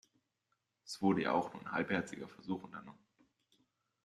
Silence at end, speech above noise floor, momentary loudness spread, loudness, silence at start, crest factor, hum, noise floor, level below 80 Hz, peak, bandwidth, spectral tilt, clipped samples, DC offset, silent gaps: 1.1 s; 47 dB; 15 LU; -37 LUFS; 0.85 s; 22 dB; none; -84 dBFS; -78 dBFS; -18 dBFS; 12 kHz; -6 dB/octave; under 0.1%; under 0.1%; none